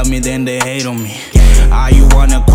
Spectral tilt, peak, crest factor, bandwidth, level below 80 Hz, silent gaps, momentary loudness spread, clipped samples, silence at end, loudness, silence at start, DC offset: -5 dB/octave; 0 dBFS; 8 dB; 15.5 kHz; -8 dBFS; none; 9 LU; 1%; 0 s; -12 LUFS; 0 s; under 0.1%